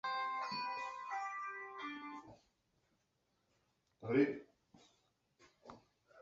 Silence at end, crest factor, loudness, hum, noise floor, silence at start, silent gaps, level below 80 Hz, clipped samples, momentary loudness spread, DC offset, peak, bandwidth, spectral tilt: 0 s; 24 dB; -41 LUFS; none; -82 dBFS; 0.05 s; none; -84 dBFS; under 0.1%; 25 LU; under 0.1%; -20 dBFS; 7.6 kHz; -3.5 dB/octave